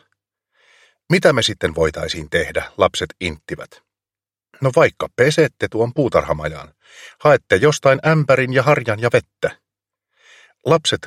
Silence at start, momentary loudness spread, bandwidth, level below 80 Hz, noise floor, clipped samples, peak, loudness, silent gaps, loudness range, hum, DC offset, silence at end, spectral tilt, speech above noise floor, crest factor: 1.1 s; 11 LU; 15 kHz; -44 dBFS; under -90 dBFS; under 0.1%; 0 dBFS; -17 LUFS; none; 4 LU; none; under 0.1%; 0 s; -5 dB/octave; over 73 dB; 18 dB